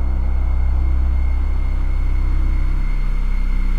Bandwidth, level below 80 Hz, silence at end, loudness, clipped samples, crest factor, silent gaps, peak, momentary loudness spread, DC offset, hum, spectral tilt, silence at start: 4.6 kHz; -16 dBFS; 0 s; -22 LUFS; under 0.1%; 8 dB; none; -8 dBFS; 4 LU; 6%; none; -8 dB/octave; 0 s